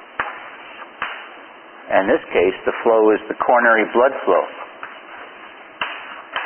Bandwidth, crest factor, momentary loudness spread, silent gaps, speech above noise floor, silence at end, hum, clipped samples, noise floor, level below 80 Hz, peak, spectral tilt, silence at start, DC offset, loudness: 3.4 kHz; 20 dB; 22 LU; none; 24 dB; 0 s; none; under 0.1%; -40 dBFS; -58 dBFS; 0 dBFS; -9 dB/octave; 0 s; under 0.1%; -18 LUFS